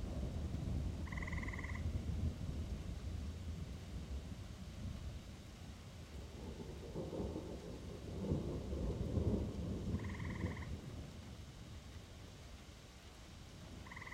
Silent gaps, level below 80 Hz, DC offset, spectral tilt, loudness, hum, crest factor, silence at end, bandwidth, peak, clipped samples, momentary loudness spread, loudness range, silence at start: none; -50 dBFS; under 0.1%; -6.5 dB/octave; -46 LUFS; none; 20 dB; 0 s; 15.5 kHz; -24 dBFS; under 0.1%; 13 LU; 8 LU; 0 s